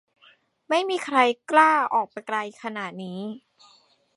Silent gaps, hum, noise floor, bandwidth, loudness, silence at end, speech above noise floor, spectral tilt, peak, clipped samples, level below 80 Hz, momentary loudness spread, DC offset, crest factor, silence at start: none; none; -59 dBFS; 11.5 kHz; -23 LUFS; 0.8 s; 36 dB; -4 dB/octave; -2 dBFS; under 0.1%; -82 dBFS; 16 LU; under 0.1%; 22 dB; 0.7 s